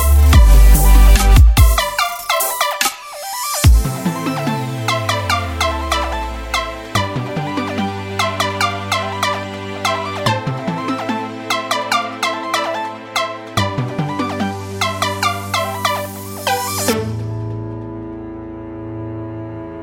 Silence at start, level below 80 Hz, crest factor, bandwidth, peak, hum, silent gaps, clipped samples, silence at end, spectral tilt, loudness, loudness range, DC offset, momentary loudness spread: 0 s; -18 dBFS; 16 dB; 17 kHz; 0 dBFS; none; none; under 0.1%; 0 s; -4.5 dB/octave; -17 LUFS; 7 LU; under 0.1%; 16 LU